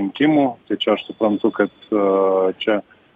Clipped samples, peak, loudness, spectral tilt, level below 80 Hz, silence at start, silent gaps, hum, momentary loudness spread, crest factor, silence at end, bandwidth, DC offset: under 0.1%; -4 dBFS; -19 LUFS; -8 dB/octave; -64 dBFS; 0 s; none; none; 6 LU; 16 dB; 0.35 s; 4.8 kHz; under 0.1%